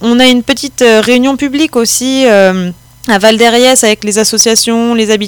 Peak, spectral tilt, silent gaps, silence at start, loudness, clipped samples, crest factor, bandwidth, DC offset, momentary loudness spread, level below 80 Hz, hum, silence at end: 0 dBFS; -2.5 dB/octave; none; 0 s; -8 LUFS; 5%; 8 dB; over 20 kHz; under 0.1%; 6 LU; -44 dBFS; none; 0 s